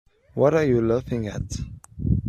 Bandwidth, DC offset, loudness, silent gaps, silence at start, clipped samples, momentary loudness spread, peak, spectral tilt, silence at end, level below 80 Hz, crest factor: 12.5 kHz; under 0.1%; -23 LUFS; none; 0.35 s; under 0.1%; 15 LU; -6 dBFS; -7.5 dB/octave; 0 s; -38 dBFS; 18 dB